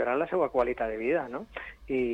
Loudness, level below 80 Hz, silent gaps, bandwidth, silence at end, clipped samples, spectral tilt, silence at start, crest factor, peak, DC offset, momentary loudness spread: -30 LUFS; -54 dBFS; none; 8 kHz; 0 s; under 0.1%; -7.5 dB/octave; 0 s; 14 dB; -14 dBFS; under 0.1%; 12 LU